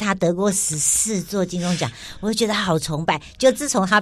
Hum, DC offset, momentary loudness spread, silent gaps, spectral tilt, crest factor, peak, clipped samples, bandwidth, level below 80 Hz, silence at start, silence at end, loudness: none; under 0.1%; 7 LU; none; -3.5 dB/octave; 16 dB; -4 dBFS; under 0.1%; 16 kHz; -48 dBFS; 0 s; 0 s; -20 LUFS